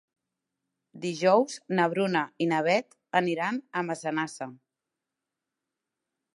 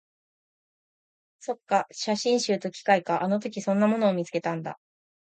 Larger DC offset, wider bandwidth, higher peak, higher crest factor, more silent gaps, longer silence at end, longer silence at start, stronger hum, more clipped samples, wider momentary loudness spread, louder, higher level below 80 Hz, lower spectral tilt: neither; first, 11.5 kHz vs 9.2 kHz; about the same, -8 dBFS vs -6 dBFS; about the same, 22 dB vs 20 dB; neither; first, 1.8 s vs 0.55 s; second, 0.95 s vs 1.45 s; neither; neither; about the same, 12 LU vs 12 LU; about the same, -27 LUFS vs -26 LUFS; second, -82 dBFS vs -76 dBFS; about the same, -5 dB/octave vs -5 dB/octave